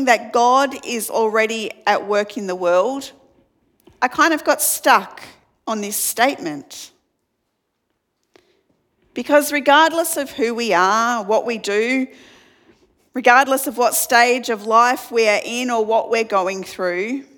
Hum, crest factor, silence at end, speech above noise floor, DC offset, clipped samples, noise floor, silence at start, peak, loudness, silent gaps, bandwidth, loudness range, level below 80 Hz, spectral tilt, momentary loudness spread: none; 18 dB; 0.15 s; 55 dB; under 0.1%; under 0.1%; -73 dBFS; 0 s; 0 dBFS; -17 LUFS; none; 19 kHz; 8 LU; -68 dBFS; -2 dB/octave; 13 LU